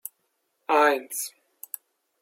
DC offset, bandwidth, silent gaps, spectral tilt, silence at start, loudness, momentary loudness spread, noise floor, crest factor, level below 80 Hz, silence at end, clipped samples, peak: under 0.1%; 16.5 kHz; none; 0 dB/octave; 0.7 s; -24 LUFS; 21 LU; -75 dBFS; 22 dB; under -90 dBFS; 0.9 s; under 0.1%; -6 dBFS